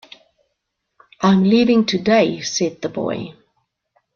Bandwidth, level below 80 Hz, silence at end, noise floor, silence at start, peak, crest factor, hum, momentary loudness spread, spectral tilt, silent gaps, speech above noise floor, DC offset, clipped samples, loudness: 7.2 kHz; -58 dBFS; 0.85 s; -75 dBFS; 1.2 s; -2 dBFS; 16 dB; none; 11 LU; -5.5 dB/octave; none; 59 dB; under 0.1%; under 0.1%; -17 LUFS